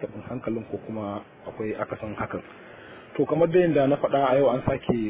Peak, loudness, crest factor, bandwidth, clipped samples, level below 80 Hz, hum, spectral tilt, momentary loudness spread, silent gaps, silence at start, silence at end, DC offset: -8 dBFS; -25 LUFS; 16 dB; 4 kHz; under 0.1%; -52 dBFS; none; -11 dB/octave; 18 LU; none; 0 s; 0 s; under 0.1%